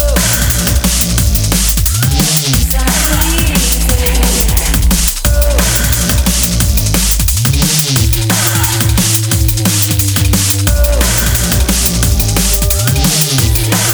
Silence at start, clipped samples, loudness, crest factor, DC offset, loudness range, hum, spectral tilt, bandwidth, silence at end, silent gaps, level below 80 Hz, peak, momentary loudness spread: 0 s; under 0.1%; -11 LUFS; 10 dB; under 0.1%; 0 LU; none; -3.5 dB/octave; over 20 kHz; 0 s; none; -14 dBFS; 0 dBFS; 1 LU